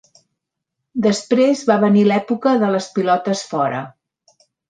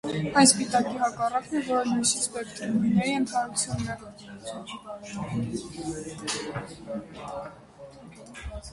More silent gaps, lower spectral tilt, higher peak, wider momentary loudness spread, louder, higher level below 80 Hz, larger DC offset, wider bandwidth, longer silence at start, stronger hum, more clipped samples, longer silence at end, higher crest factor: neither; first, -6 dB/octave vs -3.5 dB/octave; about the same, -2 dBFS vs -4 dBFS; second, 8 LU vs 18 LU; first, -17 LUFS vs -27 LUFS; second, -66 dBFS vs -52 dBFS; neither; second, 9.4 kHz vs 11.5 kHz; first, 0.95 s vs 0.05 s; neither; neither; first, 0.8 s vs 0 s; second, 16 dB vs 24 dB